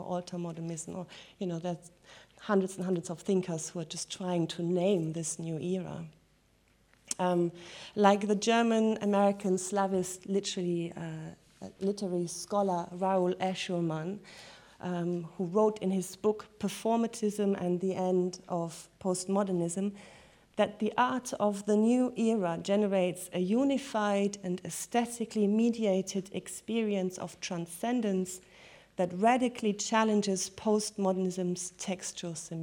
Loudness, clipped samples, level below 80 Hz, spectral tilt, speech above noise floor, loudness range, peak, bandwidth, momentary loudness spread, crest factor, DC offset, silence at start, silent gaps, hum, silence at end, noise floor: -31 LUFS; under 0.1%; -70 dBFS; -5 dB/octave; 36 dB; 5 LU; -10 dBFS; 17.5 kHz; 12 LU; 22 dB; under 0.1%; 0 s; none; none; 0 s; -67 dBFS